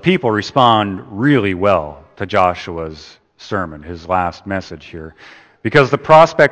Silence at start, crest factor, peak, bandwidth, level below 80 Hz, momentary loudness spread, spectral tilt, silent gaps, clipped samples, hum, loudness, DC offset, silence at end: 0 s; 16 dB; 0 dBFS; 8.8 kHz; -46 dBFS; 21 LU; -6.5 dB/octave; none; 0.1%; none; -15 LUFS; under 0.1%; 0 s